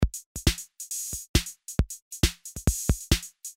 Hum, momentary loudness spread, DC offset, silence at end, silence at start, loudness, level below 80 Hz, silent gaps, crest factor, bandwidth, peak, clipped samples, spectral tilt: none; 6 LU; under 0.1%; 0.05 s; 0 s; -29 LUFS; -32 dBFS; 0.26-0.35 s, 1.29-1.34 s, 2.02-2.11 s; 22 dB; 16 kHz; -6 dBFS; under 0.1%; -3.5 dB/octave